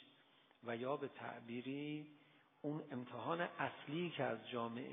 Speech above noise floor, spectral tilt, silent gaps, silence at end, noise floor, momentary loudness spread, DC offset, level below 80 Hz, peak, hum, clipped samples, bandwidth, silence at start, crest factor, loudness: 26 dB; -3 dB/octave; none; 0 s; -71 dBFS; 8 LU; under 0.1%; under -90 dBFS; -26 dBFS; none; under 0.1%; 3.7 kHz; 0 s; 20 dB; -45 LUFS